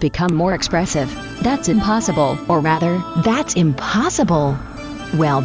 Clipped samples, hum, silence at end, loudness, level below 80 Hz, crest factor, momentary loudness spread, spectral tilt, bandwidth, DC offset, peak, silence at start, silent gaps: under 0.1%; none; 0 s; -18 LUFS; -38 dBFS; 12 dB; 6 LU; -5.5 dB/octave; 8 kHz; 0.1%; -6 dBFS; 0 s; none